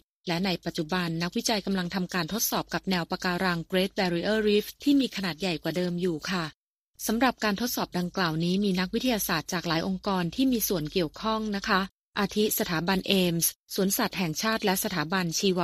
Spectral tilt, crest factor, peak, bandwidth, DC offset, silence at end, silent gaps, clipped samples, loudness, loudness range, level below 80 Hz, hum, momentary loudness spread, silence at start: -4 dB/octave; 22 dB; -6 dBFS; 15.5 kHz; under 0.1%; 0 s; 6.54-6.94 s, 11.91-12.13 s, 13.56-13.64 s; under 0.1%; -27 LUFS; 2 LU; -54 dBFS; none; 5 LU; 0.25 s